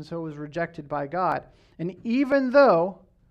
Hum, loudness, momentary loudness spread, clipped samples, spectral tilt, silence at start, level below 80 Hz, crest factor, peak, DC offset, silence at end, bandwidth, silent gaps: none; -24 LUFS; 16 LU; under 0.1%; -8 dB/octave; 0 s; -60 dBFS; 18 dB; -6 dBFS; under 0.1%; 0.35 s; 7 kHz; none